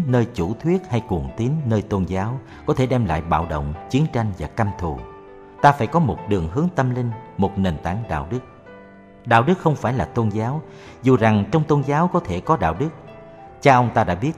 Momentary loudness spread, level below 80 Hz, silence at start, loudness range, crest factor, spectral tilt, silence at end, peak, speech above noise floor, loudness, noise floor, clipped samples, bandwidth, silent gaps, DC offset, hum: 12 LU; -40 dBFS; 0 s; 4 LU; 20 dB; -7.5 dB/octave; 0 s; 0 dBFS; 24 dB; -21 LUFS; -44 dBFS; under 0.1%; 10.5 kHz; none; under 0.1%; none